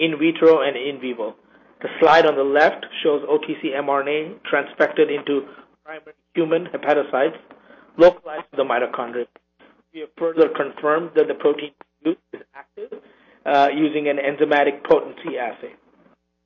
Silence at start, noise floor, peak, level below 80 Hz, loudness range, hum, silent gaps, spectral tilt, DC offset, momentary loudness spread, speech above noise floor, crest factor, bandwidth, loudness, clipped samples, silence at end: 0 s; -58 dBFS; -2 dBFS; -64 dBFS; 4 LU; none; none; -6 dB/octave; under 0.1%; 22 LU; 39 dB; 18 dB; 7 kHz; -20 LUFS; under 0.1%; 0.75 s